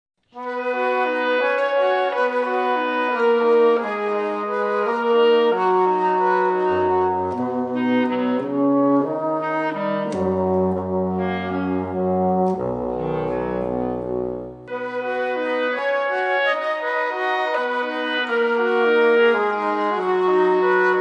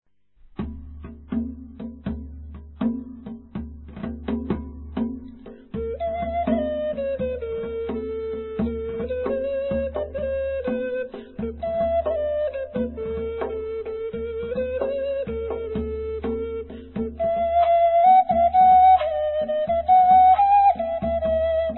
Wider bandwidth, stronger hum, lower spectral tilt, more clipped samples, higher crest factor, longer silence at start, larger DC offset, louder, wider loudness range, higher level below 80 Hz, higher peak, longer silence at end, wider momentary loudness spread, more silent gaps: first, 8.6 kHz vs 4.2 kHz; neither; second, -7 dB/octave vs -11 dB/octave; neither; about the same, 14 dB vs 16 dB; second, 0.35 s vs 0.6 s; neither; about the same, -20 LUFS vs -22 LUFS; second, 5 LU vs 15 LU; second, -54 dBFS vs -40 dBFS; about the same, -6 dBFS vs -8 dBFS; about the same, 0 s vs 0 s; second, 7 LU vs 19 LU; neither